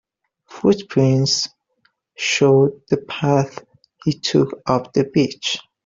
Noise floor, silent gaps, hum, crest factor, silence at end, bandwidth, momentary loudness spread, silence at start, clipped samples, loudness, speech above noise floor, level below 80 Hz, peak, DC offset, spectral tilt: -65 dBFS; none; none; 16 dB; 0.25 s; 7.8 kHz; 9 LU; 0.5 s; under 0.1%; -19 LUFS; 47 dB; -56 dBFS; -2 dBFS; under 0.1%; -5 dB/octave